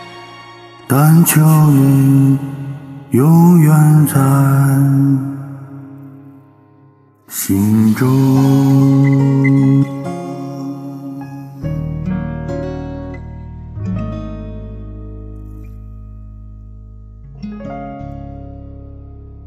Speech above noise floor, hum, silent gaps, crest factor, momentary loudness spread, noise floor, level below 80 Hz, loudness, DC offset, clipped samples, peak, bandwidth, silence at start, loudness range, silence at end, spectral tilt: 38 dB; none; none; 14 dB; 24 LU; -48 dBFS; -38 dBFS; -12 LUFS; under 0.1%; under 0.1%; 0 dBFS; 14.5 kHz; 0 s; 21 LU; 0 s; -7.5 dB/octave